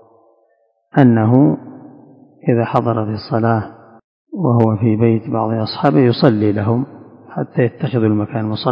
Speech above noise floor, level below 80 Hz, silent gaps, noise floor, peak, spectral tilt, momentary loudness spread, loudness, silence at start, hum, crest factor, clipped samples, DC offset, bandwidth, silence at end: 46 dB; -50 dBFS; 4.04-4.25 s; -60 dBFS; 0 dBFS; -10.5 dB/octave; 12 LU; -16 LUFS; 0.95 s; none; 16 dB; under 0.1%; under 0.1%; 5.4 kHz; 0 s